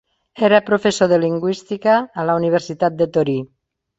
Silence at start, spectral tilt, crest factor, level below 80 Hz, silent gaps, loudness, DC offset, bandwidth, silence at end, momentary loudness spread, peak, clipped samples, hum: 0.35 s; -5.5 dB/octave; 16 dB; -58 dBFS; none; -17 LUFS; under 0.1%; 8.2 kHz; 0.55 s; 7 LU; -2 dBFS; under 0.1%; none